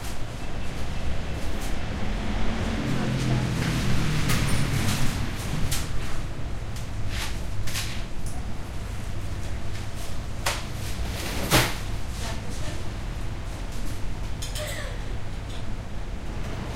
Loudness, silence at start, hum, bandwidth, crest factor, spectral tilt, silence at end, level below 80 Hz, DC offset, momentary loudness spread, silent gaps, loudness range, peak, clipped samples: -30 LUFS; 0 s; none; 16 kHz; 22 dB; -4.5 dB/octave; 0 s; -32 dBFS; under 0.1%; 10 LU; none; 7 LU; -4 dBFS; under 0.1%